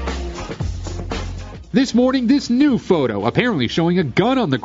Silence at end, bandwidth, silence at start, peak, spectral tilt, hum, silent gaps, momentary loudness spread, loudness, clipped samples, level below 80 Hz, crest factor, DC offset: 0 s; 7.8 kHz; 0 s; 0 dBFS; -6 dB/octave; none; none; 12 LU; -18 LUFS; under 0.1%; -34 dBFS; 18 dB; under 0.1%